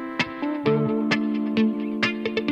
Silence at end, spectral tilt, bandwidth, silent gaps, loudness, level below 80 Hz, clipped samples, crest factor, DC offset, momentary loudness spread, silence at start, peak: 0 s; -6.5 dB/octave; 8.2 kHz; none; -24 LUFS; -64 dBFS; under 0.1%; 16 dB; under 0.1%; 4 LU; 0 s; -8 dBFS